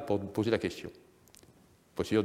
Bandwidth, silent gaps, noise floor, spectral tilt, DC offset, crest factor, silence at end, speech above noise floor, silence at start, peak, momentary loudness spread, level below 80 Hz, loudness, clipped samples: 16 kHz; none; -62 dBFS; -6 dB/octave; under 0.1%; 22 dB; 0 s; 31 dB; 0 s; -12 dBFS; 14 LU; -64 dBFS; -33 LUFS; under 0.1%